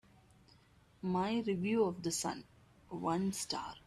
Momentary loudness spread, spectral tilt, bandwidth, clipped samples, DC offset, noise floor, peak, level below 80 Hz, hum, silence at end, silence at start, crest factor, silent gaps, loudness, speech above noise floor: 9 LU; -4.5 dB/octave; 14 kHz; under 0.1%; under 0.1%; -66 dBFS; -22 dBFS; -68 dBFS; none; 0.1 s; 1.05 s; 16 dB; none; -36 LUFS; 30 dB